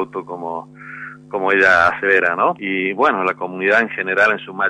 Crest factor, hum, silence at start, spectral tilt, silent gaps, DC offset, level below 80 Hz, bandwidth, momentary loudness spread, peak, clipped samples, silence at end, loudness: 16 dB; none; 0 s; -5 dB/octave; none; under 0.1%; -56 dBFS; 10 kHz; 17 LU; -2 dBFS; under 0.1%; 0 s; -16 LUFS